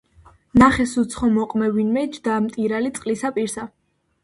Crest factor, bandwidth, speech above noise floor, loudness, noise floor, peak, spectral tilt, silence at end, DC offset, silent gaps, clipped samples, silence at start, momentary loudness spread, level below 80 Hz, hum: 20 dB; 11.5 kHz; 32 dB; -20 LUFS; -52 dBFS; 0 dBFS; -5.5 dB/octave; 0.55 s; under 0.1%; none; under 0.1%; 0.55 s; 10 LU; -44 dBFS; none